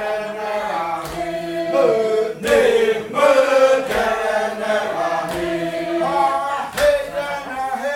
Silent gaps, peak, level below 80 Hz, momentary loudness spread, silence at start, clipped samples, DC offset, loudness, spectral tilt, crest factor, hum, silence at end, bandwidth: none; -2 dBFS; -48 dBFS; 10 LU; 0 s; under 0.1%; under 0.1%; -19 LUFS; -4 dB/octave; 16 dB; none; 0 s; 16.5 kHz